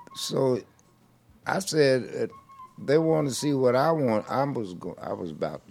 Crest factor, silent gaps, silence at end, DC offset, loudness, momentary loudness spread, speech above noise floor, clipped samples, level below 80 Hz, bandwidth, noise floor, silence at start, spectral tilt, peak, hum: 18 dB; none; 0.1 s; under 0.1%; -26 LUFS; 12 LU; 35 dB; under 0.1%; -66 dBFS; 16.5 kHz; -60 dBFS; 0 s; -5.5 dB/octave; -8 dBFS; none